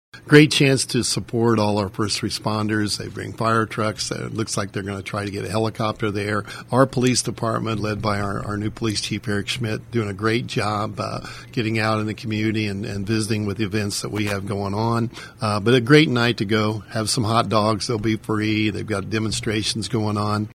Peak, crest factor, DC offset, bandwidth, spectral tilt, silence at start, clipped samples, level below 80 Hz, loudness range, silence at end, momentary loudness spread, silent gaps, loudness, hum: 0 dBFS; 22 dB; under 0.1%; 15.5 kHz; -5 dB/octave; 0.15 s; under 0.1%; -48 dBFS; 5 LU; 0 s; 9 LU; none; -22 LUFS; none